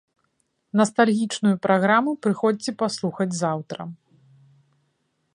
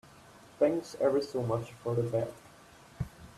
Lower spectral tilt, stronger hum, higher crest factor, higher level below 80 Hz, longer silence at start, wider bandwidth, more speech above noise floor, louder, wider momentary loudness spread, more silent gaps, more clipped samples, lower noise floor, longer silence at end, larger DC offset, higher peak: second, -5.5 dB/octave vs -7 dB/octave; neither; about the same, 20 dB vs 20 dB; second, -72 dBFS vs -60 dBFS; first, 0.75 s vs 0.6 s; second, 11.5 kHz vs 14 kHz; first, 50 dB vs 25 dB; first, -22 LUFS vs -32 LUFS; second, 10 LU vs 13 LU; neither; neither; first, -71 dBFS vs -56 dBFS; first, 1.4 s vs 0.1 s; neither; first, -4 dBFS vs -14 dBFS